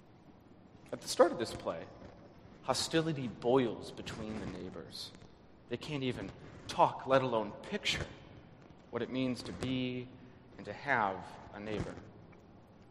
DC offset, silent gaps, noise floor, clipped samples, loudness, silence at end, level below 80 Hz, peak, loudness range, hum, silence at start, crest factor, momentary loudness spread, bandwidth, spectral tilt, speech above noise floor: under 0.1%; none; -59 dBFS; under 0.1%; -36 LUFS; 0 s; -62 dBFS; -12 dBFS; 5 LU; none; 0.05 s; 24 dB; 21 LU; 13 kHz; -4.5 dB/octave; 24 dB